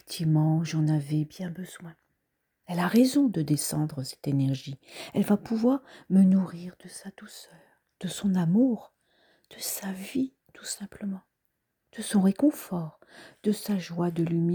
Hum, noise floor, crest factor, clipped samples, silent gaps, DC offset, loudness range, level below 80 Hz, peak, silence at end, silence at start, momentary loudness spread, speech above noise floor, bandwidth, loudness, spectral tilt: none; -79 dBFS; 16 dB; under 0.1%; none; under 0.1%; 4 LU; -68 dBFS; -10 dBFS; 0 s; 0.1 s; 19 LU; 52 dB; over 20 kHz; -27 LUFS; -6.5 dB/octave